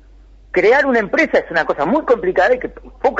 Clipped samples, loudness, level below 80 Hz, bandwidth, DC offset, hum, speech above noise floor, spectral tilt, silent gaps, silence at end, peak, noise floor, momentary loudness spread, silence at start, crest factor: under 0.1%; -15 LUFS; -44 dBFS; 7.8 kHz; under 0.1%; none; 28 dB; -5.5 dB/octave; none; 0 s; -4 dBFS; -43 dBFS; 8 LU; 0.55 s; 12 dB